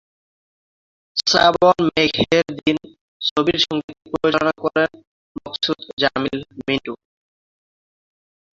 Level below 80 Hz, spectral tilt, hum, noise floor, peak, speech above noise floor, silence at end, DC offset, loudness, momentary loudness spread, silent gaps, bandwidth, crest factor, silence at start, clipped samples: -52 dBFS; -4 dB/octave; none; under -90 dBFS; 0 dBFS; over 71 dB; 1.6 s; under 0.1%; -19 LUFS; 13 LU; 3.01-3.20 s, 3.31-3.36 s, 3.84-3.88 s, 5.07-5.35 s, 5.93-5.97 s; 7.8 kHz; 20 dB; 1.15 s; under 0.1%